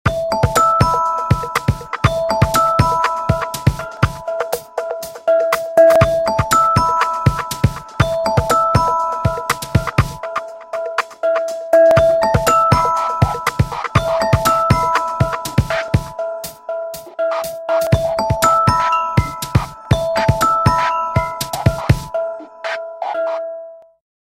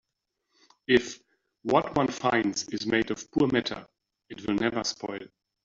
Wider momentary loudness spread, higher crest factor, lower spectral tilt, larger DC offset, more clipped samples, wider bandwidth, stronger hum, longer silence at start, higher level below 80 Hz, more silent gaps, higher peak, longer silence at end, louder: second, 12 LU vs 16 LU; second, 16 dB vs 22 dB; about the same, -5.5 dB/octave vs -4.5 dB/octave; neither; neither; first, 16.5 kHz vs 7.8 kHz; neither; second, 0.05 s vs 0.9 s; first, -32 dBFS vs -60 dBFS; neither; first, 0 dBFS vs -8 dBFS; about the same, 0.5 s vs 0.4 s; first, -16 LUFS vs -27 LUFS